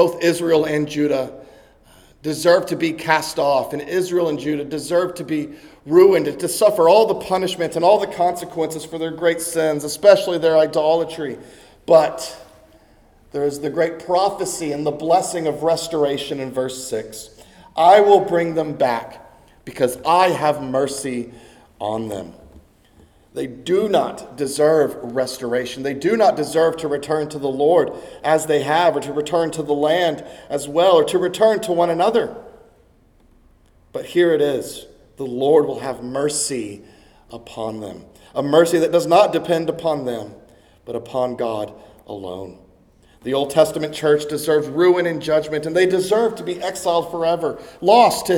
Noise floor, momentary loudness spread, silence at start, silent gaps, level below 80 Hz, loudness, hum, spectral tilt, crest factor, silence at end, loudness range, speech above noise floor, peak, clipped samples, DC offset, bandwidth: -54 dBFS; 15 LU; 0 s; none; -56 dBFS; -18 LUFS; none; -4.5 dB/octave; 18 dB; 0 s; 6 LU; 36 dB; 0 dBFS; under 0.1%; under 0.1%; 18.5 kHz